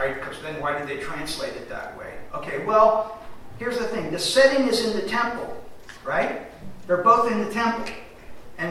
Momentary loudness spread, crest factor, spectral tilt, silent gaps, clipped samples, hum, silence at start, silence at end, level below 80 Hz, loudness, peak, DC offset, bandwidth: 20 LU; 20 dB; -4 dB/octave; none; under 0.1%; none; 0 s; 0 s; -50 dBFS; -23 LUFS; -4 dBFS; under 0.1%; 15.5 kHz